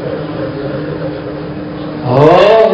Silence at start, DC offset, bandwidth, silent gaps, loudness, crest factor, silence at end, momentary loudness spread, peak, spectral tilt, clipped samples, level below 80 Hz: 0 s; under 0.1%; 8 kHz; none; -13 LUFS; 12 dB; 0 s; 16 LU; 0 dBFS; -8 dB/octave; 2%; -40 dBFS